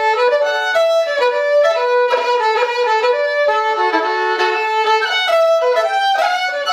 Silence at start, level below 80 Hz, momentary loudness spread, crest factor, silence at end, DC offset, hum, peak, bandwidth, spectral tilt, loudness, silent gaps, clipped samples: 0 s; -70 dBFS; 2 LU; 14 dB; 0 s; under 0.1%; none; -2 dBFS; 15 kHz; 0 dB/octave; -15 LUFS; none; under 0.1%